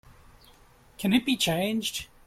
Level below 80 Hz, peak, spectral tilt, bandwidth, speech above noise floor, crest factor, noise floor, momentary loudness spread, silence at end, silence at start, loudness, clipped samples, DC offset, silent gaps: -56 dBFS; -10 dBFS; -4 dB/octave; 16.5 kHz; 30 dB; 18 dB; -56 dBFS; 8 LU; 0.2 s; 1 s; -26 LUFS; under 0.1%; under 0.1%; none